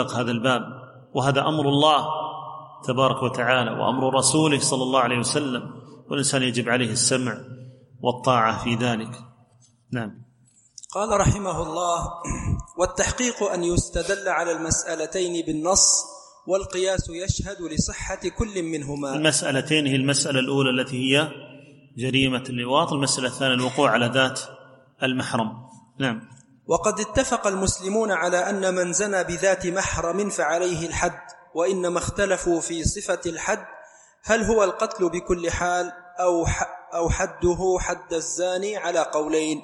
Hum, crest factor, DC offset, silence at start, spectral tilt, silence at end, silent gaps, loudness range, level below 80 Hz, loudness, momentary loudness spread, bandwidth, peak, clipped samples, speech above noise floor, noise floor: none; 20 dB; under 0.1%; 0 s; -3.5 dB/octave; 0 s; none; 4 LU; -42 dBFS; -23 LUFS; 10 LU; 12 kHz; -4 dBFS; under 0.1%; 35 dB; -58 dBFS